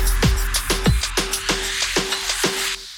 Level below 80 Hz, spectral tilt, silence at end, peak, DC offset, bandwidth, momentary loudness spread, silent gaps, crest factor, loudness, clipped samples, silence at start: -26 dBFS; -3 dB/octave; 0 s; -8 dBFS; under 0.1%; 19.5 kHz; 2 LU; none; 12 dB; -20 LUFS; under 0.1%; 0 s